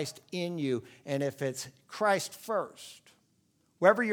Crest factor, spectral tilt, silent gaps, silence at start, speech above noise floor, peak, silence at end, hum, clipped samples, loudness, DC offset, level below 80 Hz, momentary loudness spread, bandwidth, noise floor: 24 dB; -4.5 dB/octave; none; 0 s; 40 dB; -8 dBFS; 0 s; none; under 0.1%; -32 LUFS; under 0.1%; -82 dBFS; 16 LU; 19.5 kHz; -71 dBFS